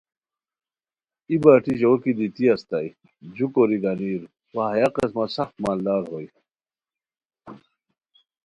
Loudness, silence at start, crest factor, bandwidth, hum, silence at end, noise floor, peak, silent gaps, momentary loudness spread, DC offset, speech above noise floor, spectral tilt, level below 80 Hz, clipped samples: -22 LUFS; 1.3 s; 24 dB; 11 kHz; none; 0.9 s; under -90 dBFS; 0 dBFS; none; 17 LU; under 0.1%; over 69 dB; -8 dB/octave; -62 dBFS; under 0.1%